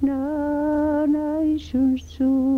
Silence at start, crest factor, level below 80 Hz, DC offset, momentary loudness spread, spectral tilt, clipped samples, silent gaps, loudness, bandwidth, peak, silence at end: 0 s; 10 dB; -44 dBFS; under 0.1%; 3 LU; -7.5 dB/octave; under 0.1%; none; -22 LUFS; 6.8 kHz; -10 dBFS; 0 s